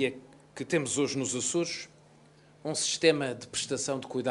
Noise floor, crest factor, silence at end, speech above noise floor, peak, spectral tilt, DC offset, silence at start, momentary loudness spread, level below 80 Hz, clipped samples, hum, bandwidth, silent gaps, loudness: -58 dBFS; 22 dB; 0 s; 28 dB; -10 dBFS; -3 dB/octave; under 0.1%; 0 s; 16 LU; -70 dBFS; under 0.1%; none; 11.5 kHz; none; -30 LUFS